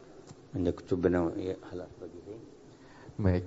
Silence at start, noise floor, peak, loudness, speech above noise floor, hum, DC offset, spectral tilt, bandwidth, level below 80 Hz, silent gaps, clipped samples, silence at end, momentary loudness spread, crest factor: 0 s; -53 dBFS; -12 dBFS; -33 LUFS; 21 dB; none; under 0.1%; -8.5 dB/octave; 8 kHz; -54 dBFS; none; under 0.1%; 0 s; 24 LU; 20 dB